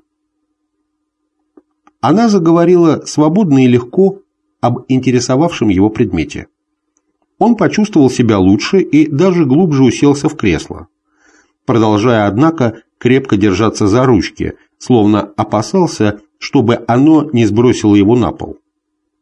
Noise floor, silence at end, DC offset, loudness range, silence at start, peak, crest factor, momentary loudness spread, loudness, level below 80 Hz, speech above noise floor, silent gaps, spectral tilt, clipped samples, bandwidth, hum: -69 dBFS; 0.7 s; under 0.1%; 3 LU; 2.05 s; 0 dBFS; 12 dB; 9 LU; -11 LUFS; -38 dBFS; 59 dB; none; -6.5 dB/octave; under 0.1%; 10.5 kHz; none